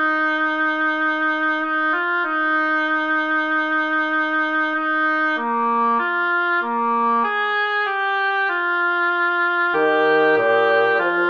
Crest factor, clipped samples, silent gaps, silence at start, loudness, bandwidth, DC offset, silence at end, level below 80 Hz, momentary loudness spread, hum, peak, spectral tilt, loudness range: 14 dB; under 0.1%; none; 0 s; -19 LUFS; 6.6 kHz; under 0.1%; 0 s; -72 dBFS; 4 LU; none; -6 dBFS; -5 dB/octave; 1 LU